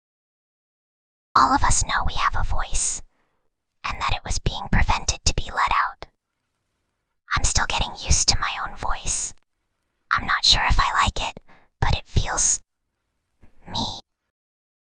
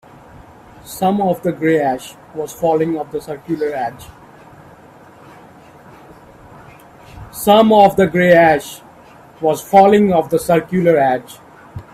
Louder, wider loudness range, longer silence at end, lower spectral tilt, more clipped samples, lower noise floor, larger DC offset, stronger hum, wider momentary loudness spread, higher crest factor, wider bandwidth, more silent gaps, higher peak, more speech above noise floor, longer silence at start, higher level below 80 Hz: second, -22 LUFS vs -14 LUFS; second, 4 LU vs 15 LU; first, 0.8 s vs 0.1 s; second, -2 dB/octave vs -6 dB/octave; neither; first, -77 dBFS vs -42 dBFS; neither; neither; second, 11 LU vs 18 LU; first, 22 dB vs 16 dB; second, 10 kHz vs 16 kHz; neither; about the same, -2 dBFS vs 0 dBFS; first, 56 dB vs 28 dB; first, 1.35 s vs 0.85 s; first, -30 dBFS vs -50 dBFS